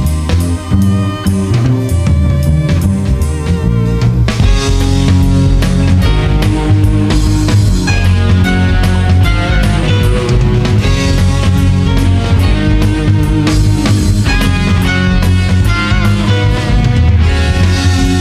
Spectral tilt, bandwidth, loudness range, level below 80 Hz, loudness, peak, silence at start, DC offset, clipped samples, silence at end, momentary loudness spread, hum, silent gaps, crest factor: -6.5 dB/octave; 14 kHz; 1 LU; -16 dBFS; -11 LUFS; 0 dBFS; 0 s; under 0.1%; under 0.1%; 0 s; 2 LU; none; none; 10 dB